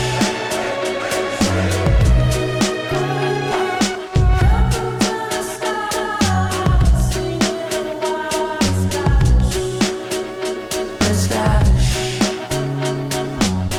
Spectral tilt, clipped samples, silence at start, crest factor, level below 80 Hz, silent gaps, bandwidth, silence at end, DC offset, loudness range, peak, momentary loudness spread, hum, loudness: -5 dB/octave; under 0.1%; 0 s; 12 dB; -22 dBFS; none; 17.5 kHz; 0 s; under 0.1%; 1 LU; -6 dBFS; 7 LU; none; -18 LUFS